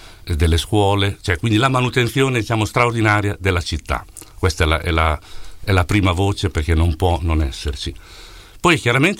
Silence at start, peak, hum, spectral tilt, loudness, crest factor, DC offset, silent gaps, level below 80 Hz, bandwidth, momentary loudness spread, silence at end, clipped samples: 0 s; -2 dBFS; none; -5.5 dB/octave; -18 LUFS; 16 dB; under 0.1%; none; -28 dBFS; 16 kHz; 10 LU; 0 s; under 0.1%